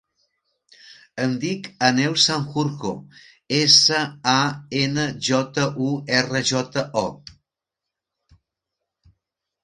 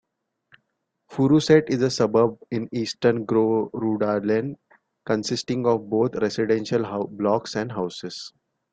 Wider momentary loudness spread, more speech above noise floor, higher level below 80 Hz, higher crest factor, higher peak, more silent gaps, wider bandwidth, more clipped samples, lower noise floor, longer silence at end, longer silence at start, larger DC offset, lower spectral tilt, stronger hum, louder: about the same, 13 LU vs 11 LU; first, 64 dB vs 54 dB; about the same, -60 dBFS vs -62 dBFS; about the same, 22 dB vs 20 dB; about the same, -2 dBFS vs -4 dBFS; neither; first, 11.5 kHz vs 9 kHz; neither; first, -85 dBFS vs -76 dBFS; first, 2.3 s vs 0.45 s; second, 0.9 s vs 1.1 s; neither; second, -3.5 dB/octave vs -6 dB/octave; neither; first, -20 LUFS vs -23 LUFS